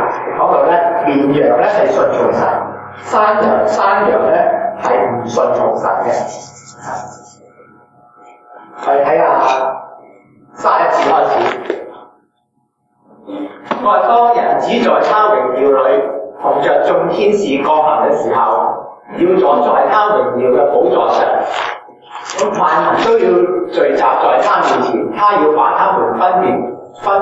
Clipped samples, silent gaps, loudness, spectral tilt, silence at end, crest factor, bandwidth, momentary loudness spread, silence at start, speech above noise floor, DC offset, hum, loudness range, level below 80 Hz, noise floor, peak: under 0.1%; none; -12 LUFS; -5.5 dB/octave; 0 s; 12 dB; 8 kHz; 13 LU; 0 s; 51 dB; under 0.1%; none; 5 LU; -64 dBFS; -62 dBFS; 0 dBFS